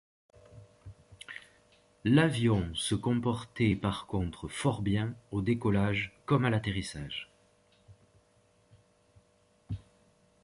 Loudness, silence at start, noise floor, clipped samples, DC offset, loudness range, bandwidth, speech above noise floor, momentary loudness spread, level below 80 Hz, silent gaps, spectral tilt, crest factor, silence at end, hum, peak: -31 LUFS; 0.55 s; -68 dBFS; under 0.1%; under 0.1%; 13 LU; 11.5 kHz; 38 dB; 18 LU; -52 dBFS; none; -6 dB/octave; 20 dB; 0.65 s; none; -12 dBFS